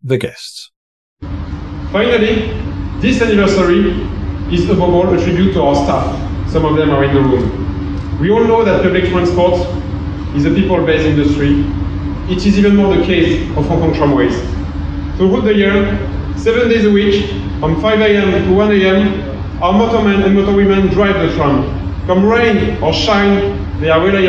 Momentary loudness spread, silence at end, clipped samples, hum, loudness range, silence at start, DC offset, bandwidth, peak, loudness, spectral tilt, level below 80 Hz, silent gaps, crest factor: 10 LU; 0 s; under 0.1%; none; 2 LU; 0.05 s; under 0.1%; 9.2 kHz; 0 dBFS; -13 LUFS; -7 dB/octave; -24 dBFS; 0.76-1.17 s; 12 dB